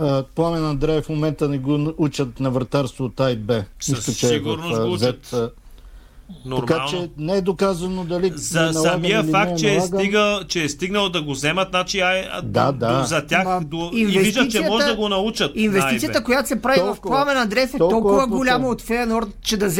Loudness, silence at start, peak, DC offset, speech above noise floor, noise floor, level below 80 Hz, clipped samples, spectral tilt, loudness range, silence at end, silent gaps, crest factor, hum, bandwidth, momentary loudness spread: -20 LUFS; 0 s; -4 dBFS; under 0.1%; 22 dB; -42 dBFS; -42 dBFS; under 0.1%; -4.5 dB/octave; 5 LU; 0 s; none; 16 dB; none; 17 kHz; 6 LU